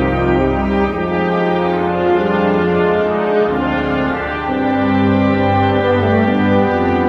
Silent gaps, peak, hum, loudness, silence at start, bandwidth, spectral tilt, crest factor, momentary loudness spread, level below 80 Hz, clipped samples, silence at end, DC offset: none; 0 dBFS; none; -15 LUFS; 0 s; 6.8 kHz; -8.5 dB/octave; 14 dB; 3 LU; -34 dBFS; under 0.1%; 0 s; under 0.1%